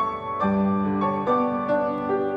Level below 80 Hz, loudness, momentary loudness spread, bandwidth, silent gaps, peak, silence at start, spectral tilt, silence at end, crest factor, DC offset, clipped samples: -56 dBFS; -24 LUFS; 3 LU; 5.2 kHz; none; -10 dBFS; 0 s; -9.5 dB/octave; 0 s; 14 dB; under 0.1%; under 0.1%